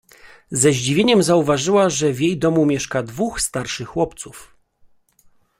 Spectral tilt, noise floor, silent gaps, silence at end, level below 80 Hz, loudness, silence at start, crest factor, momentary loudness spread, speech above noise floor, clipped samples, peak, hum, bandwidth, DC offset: -4.5 dB/octave; -55 dBFS; none; 1.15 s; -48 dBFS; -18 LUFS; 0.25 s; 18 dB; 10 LU; 37 dB; under 0.1%; -2 dBFS; none; 16 kHz; under 0.1%